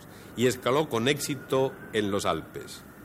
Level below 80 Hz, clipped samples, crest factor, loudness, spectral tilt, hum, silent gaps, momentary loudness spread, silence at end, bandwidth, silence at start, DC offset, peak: -60 dBFS; under 0.1%; 18 dB; -28 LUFS; -4.5 dB/octave; none; none; 15 LU; 0 s; 16.5 kHz; 0 s; under 0.1%; -10 dBFS